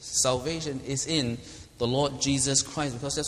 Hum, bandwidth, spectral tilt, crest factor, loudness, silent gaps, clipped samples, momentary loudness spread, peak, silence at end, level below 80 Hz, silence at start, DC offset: none; 15 kHz; -3.5 dB/octave; 20 dB; -27 LUFS; none; under 0.1%; 9 LU; -8 dBFS; 0 s; -50 dBFS; 0 s; under 0.1%